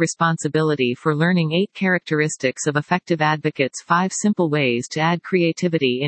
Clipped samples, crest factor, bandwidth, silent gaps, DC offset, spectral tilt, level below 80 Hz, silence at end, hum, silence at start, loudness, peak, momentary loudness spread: under 0.1%; 16 dB; 8.8 kHz; none; under 0.1%; -5 dB/octave; -68 dBFS; 0 s; none; 0 s; -20 LUFS; -2 dBFS; 3 LU